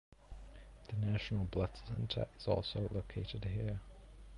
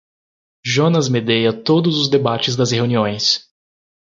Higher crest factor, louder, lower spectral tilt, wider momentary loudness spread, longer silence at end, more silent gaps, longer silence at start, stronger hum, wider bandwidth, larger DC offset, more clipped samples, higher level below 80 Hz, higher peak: about the same, 18 dB vs 16 dB; second, -40 LUFS vs -16 LUFS; first, -7.5 dB/octave vs -5 dB/octave; first, 20 LU vs 3 LU; second, 0 s vs 0.8 s; neither; second, 0.1 s vs 0.65 s; neither; first, 10.5 kHz vs 7.6 kHz; neither; neither; first, -50 dBFS vs -56 dBFS; second, -20 dBFS vs -2 dBFS